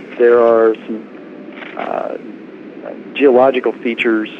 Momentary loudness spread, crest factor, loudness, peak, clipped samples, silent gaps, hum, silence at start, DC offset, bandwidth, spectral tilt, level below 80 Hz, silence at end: 23 LU; 14 dB; -14 LUFS; 0 dBFS; under 0.1%; none; none; 0 s; under 0.1%; 5.2 kHz; -7 dB/octave; -66 dBFS; 0 s